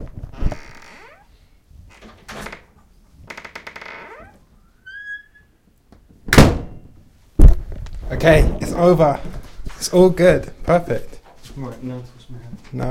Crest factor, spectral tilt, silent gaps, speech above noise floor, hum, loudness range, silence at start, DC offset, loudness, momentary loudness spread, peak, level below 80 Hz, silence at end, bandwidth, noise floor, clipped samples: 18 dB; -6 dB/octave; none; 39 dB; none; 21 LU; 0 s; under 0.1%; -17 LUFS; 25 LU; 0 dBFS; -24 dBFS; 0 s; 16 kHz; -55 dBFS; 0.2%